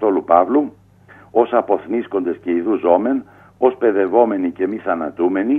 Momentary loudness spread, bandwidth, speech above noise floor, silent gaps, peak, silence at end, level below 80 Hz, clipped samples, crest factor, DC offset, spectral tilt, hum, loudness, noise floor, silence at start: 7 LU; 3.7 kHz; 29 dB; none; 0 dBFS; 0 s; -62 dBFS; under 0.1%; 18 dB; under 0.1%; -9 dB/octave; 50 Hz at -50 dBFS; -18 LUFS; -46 dBFS; 0 s